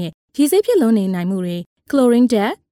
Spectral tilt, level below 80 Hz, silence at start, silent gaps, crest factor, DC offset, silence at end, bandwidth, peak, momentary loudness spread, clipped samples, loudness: -6 dB/octave; -60 dBFS; 0 s; 0.14-0.28 s, 1.66-1.76 s; 14 dB; under 0.1%; 0.15 s; 17.5 kHz; -4 dBFS; 11 LU; under 0.1%; -16 LUFS